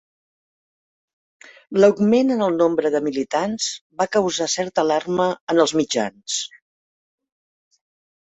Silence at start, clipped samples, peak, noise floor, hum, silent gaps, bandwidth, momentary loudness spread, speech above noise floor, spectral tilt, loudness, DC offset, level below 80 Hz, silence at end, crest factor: 1.7 s; under 0.1%; -2 dBFS; under -90 dBFS; none; 3.81-3.90 s, 5.41-5.47 s; 8.4 kHz; 9 LU; over 71 dB; -4 dB/octave; -20 LUFS; under 0.1%; -64 dBFS; 1.8 s; 20 dB